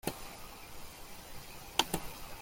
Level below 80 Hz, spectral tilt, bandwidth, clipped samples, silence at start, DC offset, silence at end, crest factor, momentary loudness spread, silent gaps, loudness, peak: -54 dBFS; -2.5 dB/octave; 16.5 kHz; under 0.1%; 0.05 s; under 0.1%; 0 s; 32 dB; 16 LU; none; -40 LUFS; -10 dBFS